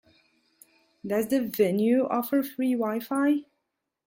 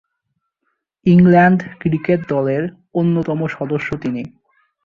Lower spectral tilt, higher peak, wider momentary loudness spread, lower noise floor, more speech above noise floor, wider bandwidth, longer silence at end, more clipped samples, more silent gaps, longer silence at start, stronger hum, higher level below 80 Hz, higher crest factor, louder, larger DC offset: second, -6 dB/octave vs -9.5 dB/octave; second, -12 dBFS vs -2 dBFS; second, 6 LU vs 13 LU; first, -81 dBFS vs -73 dBFS; about the same, 56 dB vs 58 dB; first, 17 kHz vs 4.9 kHz; about the same, 0.65 s vs 0.55 s; neither; neither; about the same, 1.05 s vs 1.05 s; neither; second, -72 dBFS vs -50 dBFS; about the same, 16 dB vs 16 dB; second, -26 LUFS vs -16 LUFS; neither